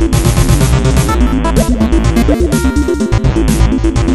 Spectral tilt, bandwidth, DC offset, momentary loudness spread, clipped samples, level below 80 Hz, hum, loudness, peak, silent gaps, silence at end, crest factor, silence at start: -6 dB/octave; 14.5 kHz; 1%; 2 LU; 0.1%; -14 dBFS; none; -12 LUFS; 0 dBFS; none; 0 s; 10 dB; 0 s